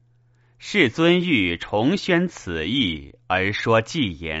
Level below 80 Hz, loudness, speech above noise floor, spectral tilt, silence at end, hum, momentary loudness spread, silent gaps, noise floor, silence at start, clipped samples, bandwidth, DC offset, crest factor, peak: -48 dBFS; -21 LUFS; 37 dB; -3.5 dB/octave; 0 s; none; 8 LU; none; -58 dBFS; 0.6 s; under 0.1%; 8 kHz; under 0.1%; 18 dB; -4 dBFS